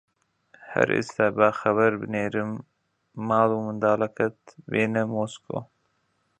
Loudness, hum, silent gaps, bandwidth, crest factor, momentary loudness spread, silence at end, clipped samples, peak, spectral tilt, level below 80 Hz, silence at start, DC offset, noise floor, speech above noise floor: -25 LUFS; none; none; 9.4 kHz; 24 dB; 13 LU; 0.75 s; under 0.1%; -2 dBFS; -6.5 dB/octave; -64 dBFS; 0.6 s; under 0.1%; -71 dBFS; 47 dB